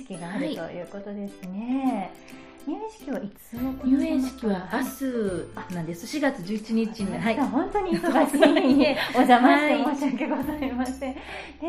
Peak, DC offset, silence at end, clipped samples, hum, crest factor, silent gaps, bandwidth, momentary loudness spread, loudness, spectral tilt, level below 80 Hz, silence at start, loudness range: -2 dBFS; under 0.1%; 0 s; under 0.1%; none; 22 dB; none; 15 kHz; 17 LU; -25 LUFS; -5.5 dB/octave; -52 dBFS; 0 s; 11 LU